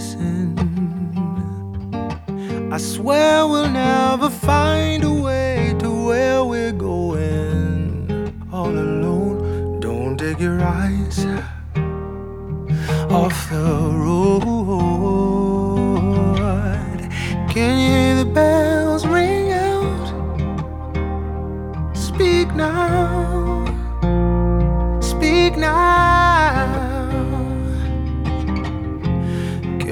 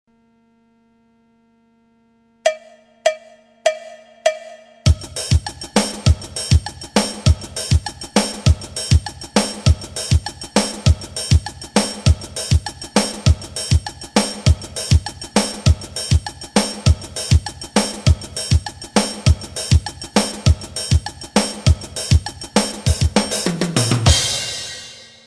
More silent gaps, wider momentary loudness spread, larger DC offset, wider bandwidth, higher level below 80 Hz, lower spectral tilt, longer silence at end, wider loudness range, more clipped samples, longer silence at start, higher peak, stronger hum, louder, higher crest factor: neither; first, 10 LU vs 4 LU; neither; first, 17.5 kHz vs 13.5 kHz; about the same, -28 dBFS vs -26 dBFS; first, -6.5 dB/octave vs -4.5 dB/octave; second, 0 s vs 0.25 s; about the same, 5 LU vs 4 LU; neither; second, 0 s vs 2.45 s; about the same, -2 dBFS vs 0 dBFS; second, none vs 50 Hz at -40 dBFS; about the same, -19 LUFS vs -19 LUFS; about the same, 16 dB vs 18 dB